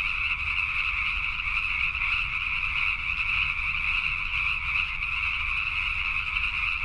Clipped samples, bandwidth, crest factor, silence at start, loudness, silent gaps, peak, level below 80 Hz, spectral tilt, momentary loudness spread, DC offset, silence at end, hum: under 0.1%; 11 kHz; 16 dB; 0 s; -25 LUFS; none; -12 dBFS; -40 dBFS; -2.5 dB/octave; 2 LU; under 0.1%; 0 s; none